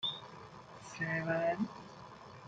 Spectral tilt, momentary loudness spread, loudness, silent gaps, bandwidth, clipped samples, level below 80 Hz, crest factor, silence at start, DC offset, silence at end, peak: -5 dB/octave; 18 LU; -37 LUFS; none; 9.2 kHz; under 0.1%; -72 dBFS; 18 dB; 0 s; under 0.1%; 0 s; -22 dBFS